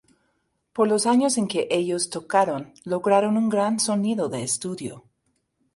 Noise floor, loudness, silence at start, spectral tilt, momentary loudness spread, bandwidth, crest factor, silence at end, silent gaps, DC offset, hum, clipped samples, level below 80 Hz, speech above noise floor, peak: -72 dBFS; -23 LUFS; 0.75 s; -4 dB/octave; 11 LU; 11.5 kHz; 18 dB; 0.75 s; none; under 0.1%; none; under 0.1%; -68 dBFS; 50 dB; -6 dBFS